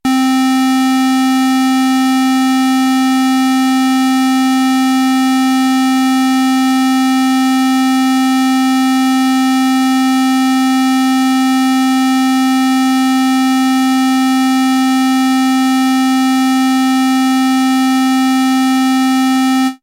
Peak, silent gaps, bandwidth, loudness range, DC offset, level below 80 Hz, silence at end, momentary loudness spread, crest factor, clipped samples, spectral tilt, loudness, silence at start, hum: -8 dBFS; none; 16.5 kHz; 0 LU; under 0.1%; -58 dBFS; 0.1 s; 0 LU; 4 dB; under 0.1%; -1.5 dB/octave; -12 LUFS; 0.05 s; none